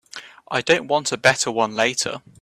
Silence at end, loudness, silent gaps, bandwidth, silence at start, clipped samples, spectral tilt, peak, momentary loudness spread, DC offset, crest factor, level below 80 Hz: 0.25 s; -20 LUFS; none; 14.5 kHz; 0.15 s; under 0.1%; -2.5 dB/octave; 0 dBFS; 10 LU; under 0.1%; 22 dB; -62 dBFS